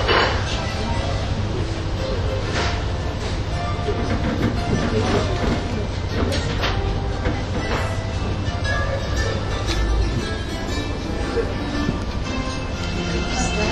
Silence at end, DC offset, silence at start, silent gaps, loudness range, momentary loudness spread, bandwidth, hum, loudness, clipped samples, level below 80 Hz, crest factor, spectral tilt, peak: 0 s; under 0.1%; 0 s; none; 2 LU; 5 LU; 12 kHz; none; -23 LUFS; under 0.1%; -28 dBFS; 18 dB; -5.5 dB/octave; -4 dBFS